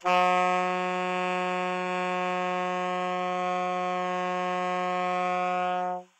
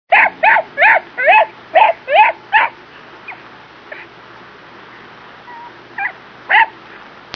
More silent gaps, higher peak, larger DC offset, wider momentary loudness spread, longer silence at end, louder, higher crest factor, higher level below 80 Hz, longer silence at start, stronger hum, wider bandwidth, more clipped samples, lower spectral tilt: neither; second, -12 dBFS vs 0 dBFS; neither; second, 5 LU vs 24 LU; second, 0.15 s vs 0.65 s; second, -28 LUFS vs -12 LUFS; about the same, 16 dB vs 16 dB; second, -88 dBFS vs -64 dBFS; about the same, 0 s vs 0.1 s; neither; first, 9 kHz vs 5.4 kHz; neither; first, -5 dB/octave vs -3.5 dB/octave